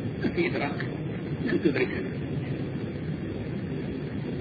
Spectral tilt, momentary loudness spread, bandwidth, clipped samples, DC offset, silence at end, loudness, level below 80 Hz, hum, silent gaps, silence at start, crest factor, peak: -9.5 dB/octave; 7 LU; 4.9 kHz; under 0.1%; under 0.1%; 0 s; -30 LUFS; -50 dBFS; none; none; 0 s; 20 dB; -10 dBFS